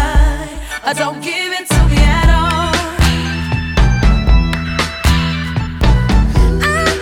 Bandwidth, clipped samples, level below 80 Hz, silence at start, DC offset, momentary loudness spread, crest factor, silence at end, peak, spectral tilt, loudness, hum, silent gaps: 15 kHz; under 0.1%; -14 dBFS; 0 s; under 0.1%; 7 LU; 12 dB; 0 s; 0 dBFS; -5 dB/octave; -14 LUFS; none; none